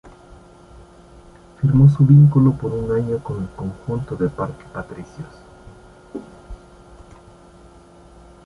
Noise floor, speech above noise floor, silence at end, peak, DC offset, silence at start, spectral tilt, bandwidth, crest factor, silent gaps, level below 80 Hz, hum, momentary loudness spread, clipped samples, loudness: -46 dBFS; 29 dB; 1.9 s; -2 dBFS; under 0.1%; 0.05 s; -10.5 dB/octave; 3.8 kHz; 18 dB; none; -42 dBFS; none; 25 LU; under 0.1%; -17 LUFS